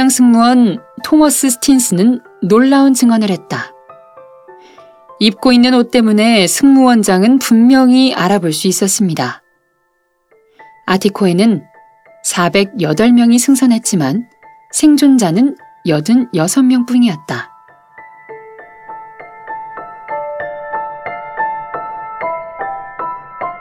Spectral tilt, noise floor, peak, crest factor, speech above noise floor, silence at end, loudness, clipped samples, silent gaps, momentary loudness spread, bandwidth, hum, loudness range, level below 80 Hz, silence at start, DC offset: -4.5 dB/octave; -61 dBFS; 0 dBFS; 12 dB; 51 dB; 0 s; -11 LUFS; under 0.1%; none; 16 LU; 16.5 kHz; none; 14 LU; -52 dBFS; 0 s; under 0.1%